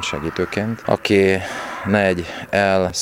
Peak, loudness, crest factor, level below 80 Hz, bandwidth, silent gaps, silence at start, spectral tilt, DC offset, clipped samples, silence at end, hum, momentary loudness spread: 0 dBFS; -19 LUFS; 18 dB; -46 dBFS; 16.5 kHz; none; 0 s; -5 dB/octave; under 0.1%; under 0.1%; 0 s; none; 9 LU